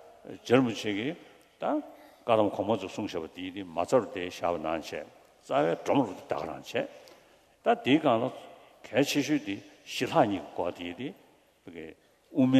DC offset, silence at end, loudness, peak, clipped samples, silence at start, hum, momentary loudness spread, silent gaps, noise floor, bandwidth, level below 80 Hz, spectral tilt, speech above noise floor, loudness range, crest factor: under 0.1%; 0 s; -30 LUFS; -8 dBFS; under 0.1%; 0.05 s; none; 16 LU; none; -60 dBFS; 13.5 kHz; -68 dBFS; -5.5 dB/octave; 31 dB; 3 LU; 22 dB